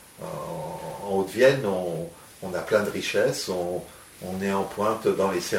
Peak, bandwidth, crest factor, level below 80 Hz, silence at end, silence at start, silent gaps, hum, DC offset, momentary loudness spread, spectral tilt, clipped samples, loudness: -6 dBFS; 16.5 kHz; 20 dB; -60 dBFS; 0 s; 0 s; none; none; under 0.1%; 15 LU; -4.5 dB/octave; under 0.1%; -26 LUFS